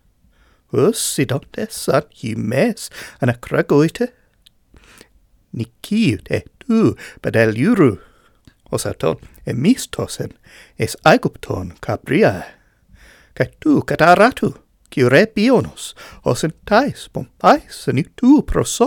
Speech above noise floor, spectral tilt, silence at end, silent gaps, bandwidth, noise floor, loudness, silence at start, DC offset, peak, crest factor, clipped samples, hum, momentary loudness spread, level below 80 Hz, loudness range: 38 dB; -5.5 dB/octave; 0 s; none; 18.5 kHz; -55 dBFS; -17 LUFS; 0.75 s; under 0.1%; 0 dBFS; 18 dB; under 0.1%; none; 15 LU; -42 dBFS; 5 LU